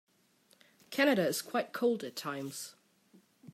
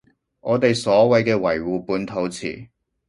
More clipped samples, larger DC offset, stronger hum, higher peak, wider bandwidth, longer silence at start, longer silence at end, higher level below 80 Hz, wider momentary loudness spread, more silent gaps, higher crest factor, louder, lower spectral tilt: neither; neither; neither; second, -14 dBFS vs -2 dBFS; first, 16 kHz vs 11.5 kHz; first, 0.9 s vs 0.45 s; second, 0.05 s vs 0.45 s; second, -84 dBFS vs -54 dBFS; about the same, 14 LU vs 15 LU; neither; about the same, 22 dB vs 18 dB; second, -33 LUFS vs -20 LUFS; second, -4 dB/octave vs -5.5 dB/octave